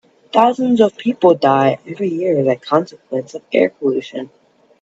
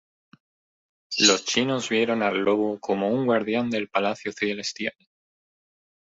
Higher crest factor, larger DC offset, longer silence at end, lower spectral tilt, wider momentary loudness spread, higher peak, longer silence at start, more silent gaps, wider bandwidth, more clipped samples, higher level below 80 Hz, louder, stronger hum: second, 16 dB vs 22 dB; neither; second, 0.55 s vs 1.2 s; first, -7 dB/octave vs -3 dB/octave; about the same, 12 LU vs 10 LU; first, 0 dBFS vs -4 dBFS; second, 0.35 s vs 1.1 s; neither; about the same, 8 kHz vs 8 kHz; neither; about the same, -64 dBFS vs -68 dBFS; first, -16 LUFS vs -24 LUFS; neither